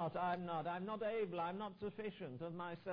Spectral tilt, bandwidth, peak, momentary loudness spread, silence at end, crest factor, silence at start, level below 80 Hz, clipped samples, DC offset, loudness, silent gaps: -5 dB/octave; 5.2 kHz; -26 dBFS; 7 LU; 0 s; 18 dB; 0 s; -78 dBFS; under 0.1%; under 0.1%; -44 LUFS; none